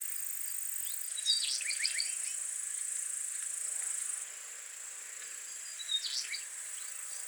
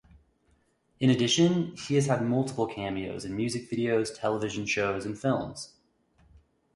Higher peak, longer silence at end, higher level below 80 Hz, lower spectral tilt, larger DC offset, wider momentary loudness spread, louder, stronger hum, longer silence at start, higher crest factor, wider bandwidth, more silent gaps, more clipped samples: second, -16 dBFS vs -12 dBFS; second, 0 s vs 1.1 s; second, under -90 dBFS vs -60 dBFS; second, 7 dB/octave vs -5 dB/octave; neither; about the same, 11 LU vs 10 LU; second, -35 LUFS vs -28 LUFS; neither; second, 0 s vs 1 s; about the same, 22 dB vs 18 dB; first, over 20 kHz vs 11.5 kHz; neither; neither